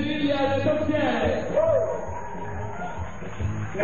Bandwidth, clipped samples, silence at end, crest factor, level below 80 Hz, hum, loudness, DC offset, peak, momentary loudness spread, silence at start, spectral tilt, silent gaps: 7.2 kHz; under 0.1%; 0 s; 14 dB; -42 dBFS; none; -26 LUFS; 2%; -12 dBFS; 12 LU; 0 s; -6.5 dB/octave; none